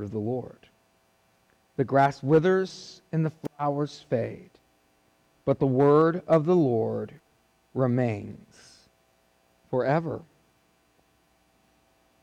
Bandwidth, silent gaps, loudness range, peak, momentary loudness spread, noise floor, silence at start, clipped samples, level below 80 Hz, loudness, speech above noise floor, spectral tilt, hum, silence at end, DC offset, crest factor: 9.6 kHz; none; 9 LU; -12 dBFS; 17 LU; -66 dBFS; 0 s; under 0.1%; -66 dBFS; -26 LUFS; 41 dB; -8 dB/octave; none; 2 s; under 0.1%; 16 dB